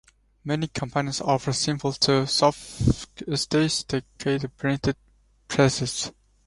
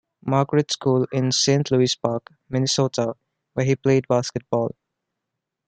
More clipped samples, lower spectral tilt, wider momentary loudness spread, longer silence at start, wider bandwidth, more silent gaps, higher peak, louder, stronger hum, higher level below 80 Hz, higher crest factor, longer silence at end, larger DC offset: neither; about the same, -4.5 dB/octave vs -5 dB/octave; about the same, 9 LU vs 10 LU; first, 0.45 s vs 0.25 s; first, 11.5 kHz vs 9.2 kHz; neither; about the same, -4 dBFS vs -2 dBFS; second, -25 LUFS vs -22 LUFS; neither; first, -44 dBFS vs -60 dBFS; about the same, 20 dB vs 20 dB; second, 0.35 s vs 1 s; neither